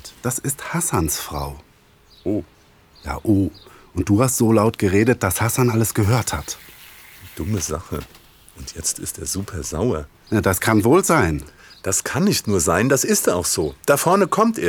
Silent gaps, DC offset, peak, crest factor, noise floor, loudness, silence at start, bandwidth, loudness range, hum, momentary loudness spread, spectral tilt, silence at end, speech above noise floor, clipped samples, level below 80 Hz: none; under 0.1%; -2 dBFS; 18 dB; -52 dBFS; -19 LUFS; 0.05 s; over 20 kHz; 8 LU; none; 15 LU; -4.5 dB/octave; 0 s; 33 dB; under 0.1%; -40 dBFS